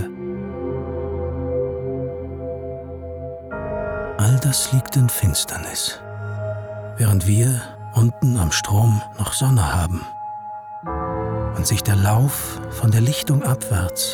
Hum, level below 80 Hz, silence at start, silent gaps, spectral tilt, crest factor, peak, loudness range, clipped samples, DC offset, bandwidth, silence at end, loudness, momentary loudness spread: none; -40 dBFS; 0 s; none; -5 dB/octave; 12 dB; -8 dBFS; 8 LU; under 0.1%; under 0.1%; 20 kHz; 0 s; -21 LUFS; 14 LU